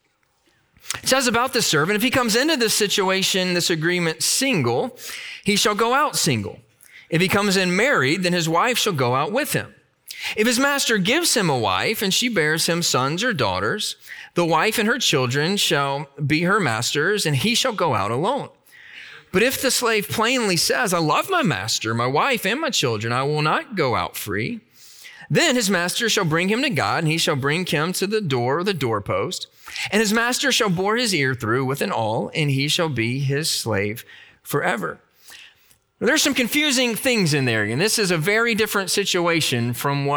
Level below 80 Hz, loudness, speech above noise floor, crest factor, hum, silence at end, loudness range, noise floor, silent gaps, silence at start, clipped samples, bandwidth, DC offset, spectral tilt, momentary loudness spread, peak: -60 dBFS; -20 LUFS; 44 dB; 16 dB; none; 0 s; 3 LU; -64 dBFS; none; 0.85 s; under 0.1%; over 20 kHz; under 0.1%; -3.5 dB/octave; 8 LU; -6 dBFS